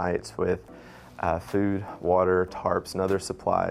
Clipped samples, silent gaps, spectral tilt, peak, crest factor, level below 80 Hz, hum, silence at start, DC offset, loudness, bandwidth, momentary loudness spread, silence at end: under 0.1%; none; -6 dB/octave; -10 dBFS; 16 dB; -54 dBFS; none; 0 s; under 0.1%; -27 LUFS; 15 kHz; 9 LU; 0 s